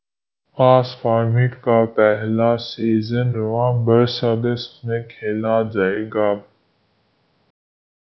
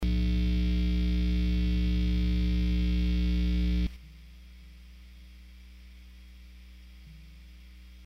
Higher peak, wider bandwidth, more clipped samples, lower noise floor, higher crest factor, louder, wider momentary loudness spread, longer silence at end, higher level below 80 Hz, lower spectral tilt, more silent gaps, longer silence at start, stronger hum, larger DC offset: first, 0 dBFS vs -18 dBFS; about the same, 6 kHz vs 6.2 kHz; neither; first, -77 dBFS vs -49 dBFS; first, 20 dB vs 10 dB; first, -19 LUFS vs -29 LUFS; second, 10 LU vs 23 LU; first, 1.7 s vs 0 s; second, -58 dBFS vs -30 dBFS; first, -9 dB/octave vs -7.5 dB/octave; neither; first, 0.55 s vs 0 s; second, none vs 60 Hz at -35 dBFS; neither